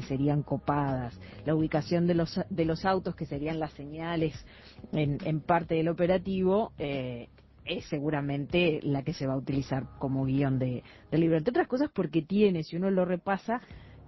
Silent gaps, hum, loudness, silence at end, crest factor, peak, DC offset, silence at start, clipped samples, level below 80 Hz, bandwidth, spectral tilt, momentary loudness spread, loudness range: none; none; -30 LUFS; 0 s; 18 dB; -12 dBFS; under 0.1%; 0 s; under 0.1%; -52 dBFS; 6 kHz; -8 dB/octave; 9 LU; 3 LU